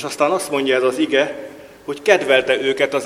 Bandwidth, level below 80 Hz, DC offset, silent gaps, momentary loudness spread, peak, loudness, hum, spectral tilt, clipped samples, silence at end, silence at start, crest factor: 15.5 kHz; -60 dBFS; under 0.1%; none; 17 LU; 0 dBFS; -17 LUFS; none; -3 dB/octave; under 0.1%; 0 s; 0 s; 18 dB